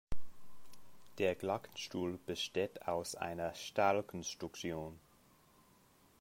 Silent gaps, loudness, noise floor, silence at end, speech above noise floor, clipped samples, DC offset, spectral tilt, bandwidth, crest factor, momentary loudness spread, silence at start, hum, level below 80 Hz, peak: none; -39 LUFS; -68 dBFS; 1.25 s; 29 dB; under 0.1%; under 0.1%; -4 dB/octave; 16 kHz; 20 dB; 15 LU; 0.1 s; none; -58 dBFS; -18 dBFS